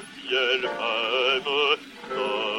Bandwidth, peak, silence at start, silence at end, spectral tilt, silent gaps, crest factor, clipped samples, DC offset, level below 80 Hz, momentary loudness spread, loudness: 16.5 kHz; -10 dBFS; 0 s; 0 s; -2.5 dB/octave; none; 16 dB; under 0.1%; under 0.1%; -68 dBFS; 5 LU; -24 LUFS